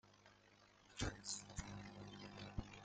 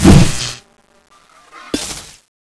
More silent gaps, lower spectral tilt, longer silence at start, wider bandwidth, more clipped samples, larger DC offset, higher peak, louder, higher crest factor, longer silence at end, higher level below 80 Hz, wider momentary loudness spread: neither; second, -3.5 dB/octave vs -5.5 dB/octave; about the same, 0.05 s vs 0 s; second, 9.8 kHz vs 11 kHz; second, under 0.1% vs 0.7%; neither; second, -28 dBFS vs 0 dBFS; second, -51 LUFS vs -15 LUFS; first, 24 dB vs 14 dB; second, 0 s vs 0.45 s; second, -60 dBFS vs -22 dBFS; second, 21 LU vs 27 LU